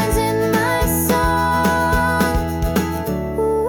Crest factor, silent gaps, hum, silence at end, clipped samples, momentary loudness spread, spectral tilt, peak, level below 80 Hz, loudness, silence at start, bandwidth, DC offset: 12 dB; none; none; 0 s; under 0.1%; 4 LU; -5 dB/octave; -6 dBFS; -28 dBFS; -18 LUFS; 0 s; 19 kHz; under 0.1%